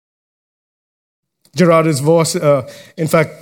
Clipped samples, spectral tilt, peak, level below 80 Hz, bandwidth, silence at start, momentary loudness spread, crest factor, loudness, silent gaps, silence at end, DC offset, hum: under 0.1%; -5.5 dB/octave; 0 dBFS; -60 dBFS; 18 kHz; 1.55 s; 13 LU; 16 dB; -14 LUFS; none; 0.05 s; under 0.1%; none